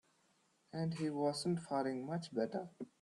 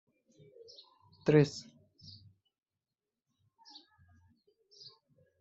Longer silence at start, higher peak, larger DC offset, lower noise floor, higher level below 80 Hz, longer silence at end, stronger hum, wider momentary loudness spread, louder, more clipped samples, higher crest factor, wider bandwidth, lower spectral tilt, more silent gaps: second, 0.75 s vs 1.25 s; second, -24 dBFS vs -12 dBFS; neither; second, -76 dBFS vs under -90 dBFS; second, -80 dBFS vs -74 dBFS; second, 0.15 s vs 3.8 s; neither; second, 8 LU vs 29 LU; second, -40 LUFS vs -29 LUFS; neither; second, 16 dB vs 26 dB; first, 12 kHz vs 8 kHz; about the same, -6 dB/octave vs -7 dB/octave; neither